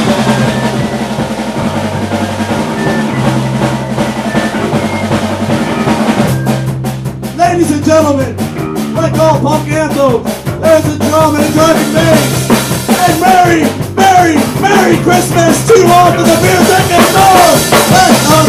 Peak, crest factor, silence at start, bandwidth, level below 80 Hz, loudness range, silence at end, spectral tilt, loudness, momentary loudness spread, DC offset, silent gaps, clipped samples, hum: 0 dBFS; 8 dB; 0 s; 16 kHz; -34 dBFS; 7 LU; 0 s; -5 dB/octave; -9 LUFS; 9 LU; under 0.1%; none; 1%; none